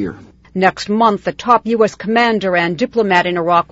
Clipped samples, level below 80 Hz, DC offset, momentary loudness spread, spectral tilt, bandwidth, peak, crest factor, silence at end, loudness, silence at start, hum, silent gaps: under 0.1%; -50 dBFS; under 0.1%; 3 LU; -5.5 dB/octave; 8 kHz; 0 dBFS; 14 dB; 0.1 s; -15 LUFS; 0 s; none; none